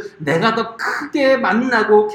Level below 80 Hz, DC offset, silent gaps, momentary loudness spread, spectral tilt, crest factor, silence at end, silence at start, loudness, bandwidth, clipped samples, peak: -58 dBFS; under 0.1%; none; 7 LU; -5.5 dB/octave; 16 dB; 0 s; 0 s; -16 LUFS; 13.5 kHz; under 0.1%; 0 dBFS